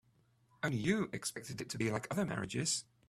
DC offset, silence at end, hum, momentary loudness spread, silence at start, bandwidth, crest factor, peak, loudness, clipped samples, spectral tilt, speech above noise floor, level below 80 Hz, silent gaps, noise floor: under 0.1%; 0.25 s; none; 7 LU; 0.65 s; 15 kHz; 20 dB; -18 dBFS; -37 LUFS; under 0.1%; -4 dB/octave; 35 dB; -68 dBFS; none; -72 dBFS